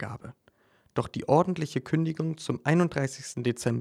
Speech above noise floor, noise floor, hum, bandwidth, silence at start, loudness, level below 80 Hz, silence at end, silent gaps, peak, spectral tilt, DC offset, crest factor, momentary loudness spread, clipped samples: 37 dB; -64 dBFS; none; 13 kHz; 0 s; -28 LUFS; -62 dBFS; 0 s; none; -8 dBFS; -6.5 dB/octave; under 0.1%; 20 dB; 11 LU; under 0.1%